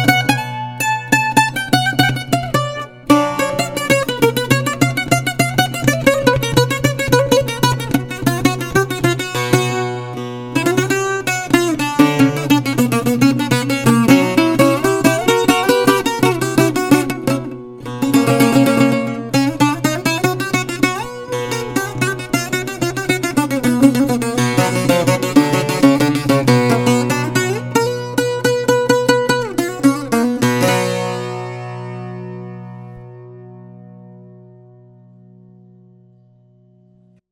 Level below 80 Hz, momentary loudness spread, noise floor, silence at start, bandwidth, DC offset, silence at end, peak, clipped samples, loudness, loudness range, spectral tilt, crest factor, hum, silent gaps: -44 dBFS; 9 LU; -51 dBFS; 0 s; 17.5 kHz; under 0.1%; 3.05 s; 0 dBFS; under 0.1%; -15 LUFS; 5 LU; -5 dB/octave; 16 dB; none; none